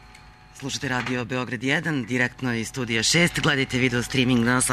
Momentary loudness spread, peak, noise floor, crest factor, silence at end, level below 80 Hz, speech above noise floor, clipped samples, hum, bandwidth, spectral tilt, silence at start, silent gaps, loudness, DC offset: 9 LU; -6 dBFS; -48 dBFS; 16 dB; 0 s; -48 dBFS; 25 dB; under 0.1%; none; 13.5 kHz; -3.5 dB/octave; 0.05 s; none; -23 LUFS; under 0.1%